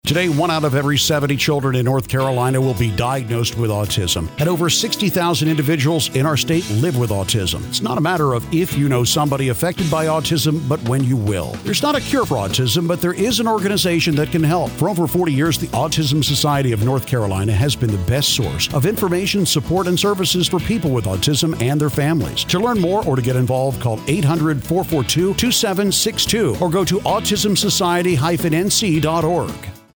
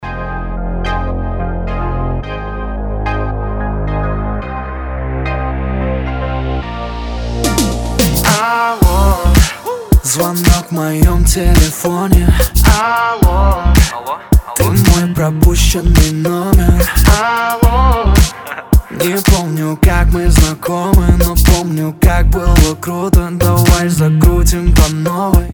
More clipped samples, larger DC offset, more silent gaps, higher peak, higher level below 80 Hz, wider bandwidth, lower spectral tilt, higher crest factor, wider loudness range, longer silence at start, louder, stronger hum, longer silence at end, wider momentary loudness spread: second, under 0.1% vs 0.4%; neither; neither; second, -4 dBFS vs 0 dBFS; second, -40 dBFS vs -14 dBFS; about the same, over 20 kHz vs over 20 kHz; about the same, -4.5 dB/octave vs -5 dB/octave; about the same, 14 dB vs 12 dB; second, 2 LU vs 8 LU; about the same, 0.05 s vs 0 s; second, -17 LUFS vs -13 LUFS; neither; first, 0.2 s vs 0 s; second, 4 LU vs 10 LU